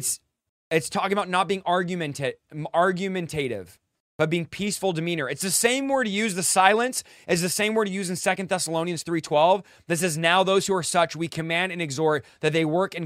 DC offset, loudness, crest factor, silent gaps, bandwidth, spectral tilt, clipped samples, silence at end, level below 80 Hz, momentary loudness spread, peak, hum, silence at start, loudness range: under 0.1%; -24 LUFS; 24 dB; 0.49-0.71 s, 4.00-4.19 s; 16 kHz; -3.5 dB/octave; under 0.1%; 0 s; -64 dBFS; 8 LU; -2 dBFS; none; 0 s; 4 LU